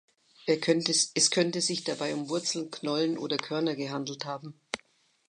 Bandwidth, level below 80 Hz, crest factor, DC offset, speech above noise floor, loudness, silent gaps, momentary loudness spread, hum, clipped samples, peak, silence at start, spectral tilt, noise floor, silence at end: 11 kHz; -80 dBFS; 22 dB; under 0.1%; 36 dB; -29 LUFS; none; 15 LU; none; under 0.1%; -8 dBFS; 0.45 s; -3 dB/octave; -66 dBFS; 0.5 s